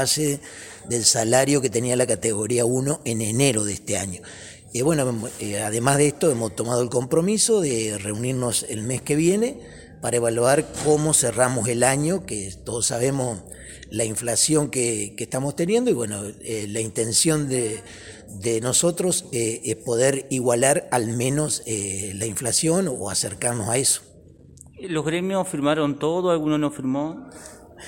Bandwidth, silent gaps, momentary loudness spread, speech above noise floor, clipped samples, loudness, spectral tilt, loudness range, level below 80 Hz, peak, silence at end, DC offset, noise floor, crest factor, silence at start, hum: 17 kHz; none; 11 LU; 25 dB; under 0.1%; -22 LUFS; -4 dB/octave; 3 LU; -54 dBFS; -2 dBFS; 0 s; under 0.1%; -48 dBFS; 20 dB; 0 s; none